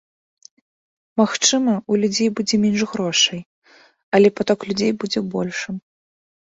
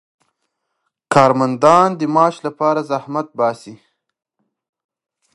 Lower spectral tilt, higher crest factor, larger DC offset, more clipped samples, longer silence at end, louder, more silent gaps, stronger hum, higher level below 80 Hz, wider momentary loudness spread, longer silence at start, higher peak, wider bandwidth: second, -3.5 dB/octave vs -6 dB/octave; about the same, 18 dB vs 18 dB; neither; neither; second, 0.7 s vs 1.6 s; second, -19 LUFS vs -15 LUFS; first, 3.46-3.62 s, 4.03-4.12 s vs none; neither; about the same, -60 dBFS vs -62 dBFS; about the same, 10 LU vs 10 LU; about the same, 1.15 s vs 1.1 s; about the same, -2 dBFS vs 0 dBFS; second, 8 kHz vs 11.5 kHz